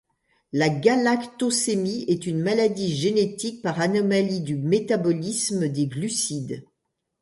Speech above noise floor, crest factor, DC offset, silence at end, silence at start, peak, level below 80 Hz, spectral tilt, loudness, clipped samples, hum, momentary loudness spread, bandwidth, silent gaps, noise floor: 56 dB; 20 dB; under 0.1%; 0.6 s; 0.55 s; -4 dBFS; -64 dBFS; -4.5 dB/octave; -23 LUFS; under 0.1%; none; 6 LU; 11.5 kHz; none; -79 dBFS